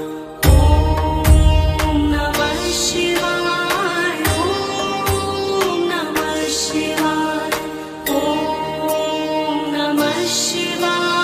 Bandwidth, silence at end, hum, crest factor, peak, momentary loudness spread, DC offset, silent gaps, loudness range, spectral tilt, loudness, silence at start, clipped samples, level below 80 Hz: 15.5 kHz; 0 s; none; 16 dB; 0 dBFS; 6 LU; under 0.1%; none; 4 LU; -4.5 dB/octave; -18 LUFS; 0 s; under 0.1%; -24 dBFS